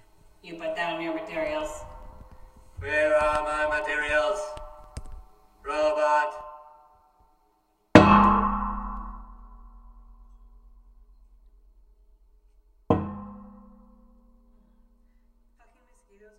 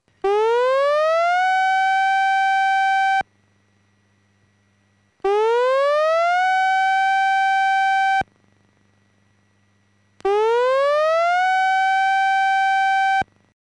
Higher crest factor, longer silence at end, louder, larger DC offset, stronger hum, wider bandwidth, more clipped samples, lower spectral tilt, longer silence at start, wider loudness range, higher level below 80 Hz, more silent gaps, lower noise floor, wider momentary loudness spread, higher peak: first, 28 dB vs 8 dB; first, 2.9 s vs 0.4 s; second, -24 LUFS vs -18 LUFS; neither; neither; first, 12 kHz vs 10.5 kHz; neither; first, -6 dB/octave vs -2 dB/octave; first, 0.45 s vs 0.25 s; first, 13 LU vs 5 LU; first, -44 dBFS vs -62 dBFS; neither; first, -68 dBFS vs -62 dBFS; first, 26 LU vs 4 LU; first, 0 dBFS vs -12 dBFS